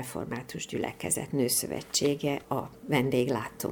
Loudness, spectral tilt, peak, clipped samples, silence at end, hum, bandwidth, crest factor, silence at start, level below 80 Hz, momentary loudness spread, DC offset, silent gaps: -30 LUFS; -4 dB/octave; -12 dBFS; under 0.1%; 0 s; none; over 20 kHz; 18 dB; 0 s; -60 dBFS; 9 LU; under 0.1%; none